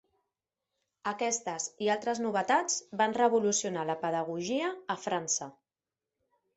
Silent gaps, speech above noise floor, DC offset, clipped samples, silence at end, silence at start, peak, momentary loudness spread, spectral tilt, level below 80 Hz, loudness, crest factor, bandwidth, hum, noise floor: none; over 59 dB; under 0.1%; under 0.1%; 1.05 s; 1.05 s; -12 dBFS; 8 LU; -3 dB/octave; -78 dBFS; -31 LUFS; 20 dB; 8.4 kHz; none; under -90 dBFS